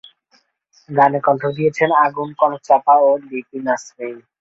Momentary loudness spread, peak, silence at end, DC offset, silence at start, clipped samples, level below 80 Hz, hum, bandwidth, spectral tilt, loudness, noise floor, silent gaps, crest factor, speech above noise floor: 14 LU; -2 dBFS; 0.2 s; under 0.1%; 0.9 s; under 0.1%; -66 dBFS; none; 7.8 kHz; -6 dB/octave; -16 LUFS; -60 dBFS; none; 16 dB; 43 dB